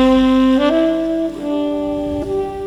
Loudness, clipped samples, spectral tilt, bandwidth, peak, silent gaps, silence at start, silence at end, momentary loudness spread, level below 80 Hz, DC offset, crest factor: -16 LUFS; under 0.1%; -6.5 dB/octave; 10.5 kHz; -2 dBFS; none; 0 s; 0 s; 8 LU; -36 dBFS; under 0.1%; 14 dB